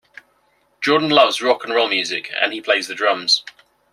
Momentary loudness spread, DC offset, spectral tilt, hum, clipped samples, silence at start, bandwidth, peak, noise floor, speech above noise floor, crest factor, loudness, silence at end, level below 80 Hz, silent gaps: 6 LU; under 0.1%; -2.5 dB/octave; none; under 0.1%; 0.8 s; 14.5 kHz; -2 dBFS; -61 dBFS; 43 dB; 18 dB; -17 LUFS; 0.45 s; -68 dBFS; none